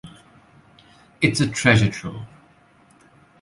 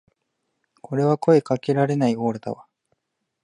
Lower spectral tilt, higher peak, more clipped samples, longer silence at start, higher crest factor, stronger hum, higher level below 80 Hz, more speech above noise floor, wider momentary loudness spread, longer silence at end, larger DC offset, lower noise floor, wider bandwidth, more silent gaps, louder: second, -5 dB/octave vs -8 dB/octave; about the same, -2 dBFS vs -4 dBFS; neither; second, 0.05 s vs 0.9 s; about the same, 22 dB vs 18 dB; neither; first, -48 dBFS vs -68 dBFS; second, 35 dB vs 56 dB; first, 21 LU vs 14 LU; first, 1.15 s vs 0.85 s; neither; second, -55 dBFS vs -76 dBFS; about the same, 11.5 kHz vs 11 kHz; neither; about the same, -19 LUFS vs -21 LUFS